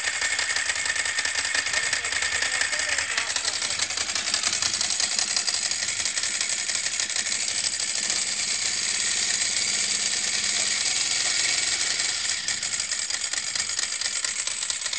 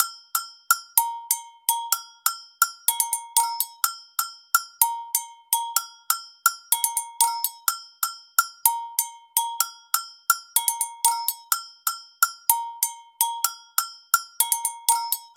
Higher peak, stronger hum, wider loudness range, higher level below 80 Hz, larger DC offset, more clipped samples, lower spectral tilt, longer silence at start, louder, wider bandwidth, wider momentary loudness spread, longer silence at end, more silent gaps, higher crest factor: second, -6 dBFS vs -2 dBFS; neither; about the same, 2 LU vs 1 LU; first, -60 dBFS vs under -90 dBFS; first, 0.1% vs under 0.1%; neither; first, 2 dB/octave vs 7.5 dB/octave; about the same, 0 s vs 0 s; about the same, -22 LUFS vs -24 LUFS; second, 8 kHz vs 19.5 kHz; second, 3 LU vs 6 LU; about the same, 0 s vs 0.1 s; neither; second, 18 dB vs 24 dB